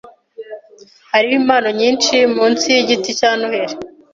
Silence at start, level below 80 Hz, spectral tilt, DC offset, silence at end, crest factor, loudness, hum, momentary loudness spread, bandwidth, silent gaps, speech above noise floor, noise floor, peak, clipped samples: 0.05 s; -62 dBFS; -2 dB/octave; under 0.1%; 0.25 s; 14 dB; -14 LUFS; none; 20 LU; 7.6 kHz; none; 20 dB; -35 dBFS; -2 dBFS; under 0.1%